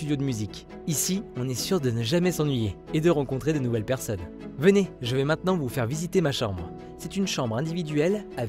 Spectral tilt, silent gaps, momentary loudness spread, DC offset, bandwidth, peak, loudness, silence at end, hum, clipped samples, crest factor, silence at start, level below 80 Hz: -5.5 dB/octave; none; 9 LU; under 0.1%; 16 kHz; -6 dBFS; -26 LUFS; 0 s; none; under 0.1%; 20 dB; 0 s; -50 dBFS